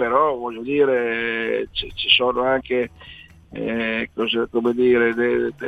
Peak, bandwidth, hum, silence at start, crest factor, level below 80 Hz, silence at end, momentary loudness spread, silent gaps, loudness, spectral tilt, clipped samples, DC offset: -2 dBFS; 6 kHz; none; 0 s; 18 dB; -48 dBFS; 0 s; 10 LU; none; -20 LUFS; -6 dB/octave; under 0.1%; under 0.1%